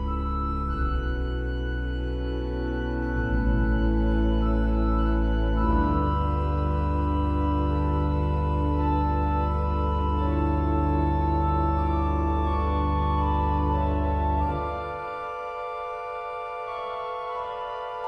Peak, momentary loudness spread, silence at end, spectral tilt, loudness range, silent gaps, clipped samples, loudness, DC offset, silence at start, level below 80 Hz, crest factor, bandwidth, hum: -12 dBFS; 8 LU; 0 s; -9.5 dB/octave; 4 LU; none; under 0.1%; -26 LUFS; under 0.1%; 0 s; -28 dBFS; 12 dB; 5.2 kHz; none